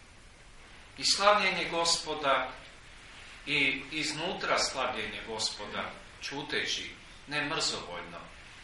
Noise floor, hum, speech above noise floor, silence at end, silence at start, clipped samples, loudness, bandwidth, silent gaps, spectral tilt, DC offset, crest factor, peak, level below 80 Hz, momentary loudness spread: -53 dBFS; none; 22 dB; 0 s; 0 s; under 0.1%; -30 LUFS; 11.5 kHz; none; -1.5 dB/octave; under 0.1%; 24 dB; -8 dBFS; -56 dBFS; 22 LU